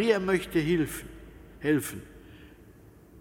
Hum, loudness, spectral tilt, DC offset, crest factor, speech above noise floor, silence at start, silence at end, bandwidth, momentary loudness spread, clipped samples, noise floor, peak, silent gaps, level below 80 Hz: none; -28 LUFS; -5.5 dB/octave; under 0.1%; 20 dB; 26 dB; 0 s; 0 s; 17 kHz; 23 LU; under 0.1%; -53 dBFS; -10 dBFS; none; -52 dBFS